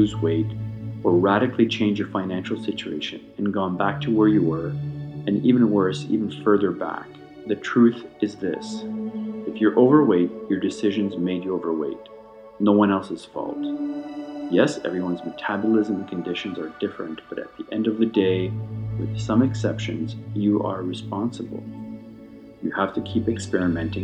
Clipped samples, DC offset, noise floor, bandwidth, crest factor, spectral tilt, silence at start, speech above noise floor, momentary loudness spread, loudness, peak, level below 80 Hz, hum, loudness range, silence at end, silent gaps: under 0.1%; under 0.1%; -43 dBFS; 9.4 kHz; 20 dB; -7 dB/octave; 0 s; 21 dB; 14 LU; -23 LUFS; -2 dBFS; -54 dBFS; none; 5 LU; 0 s; none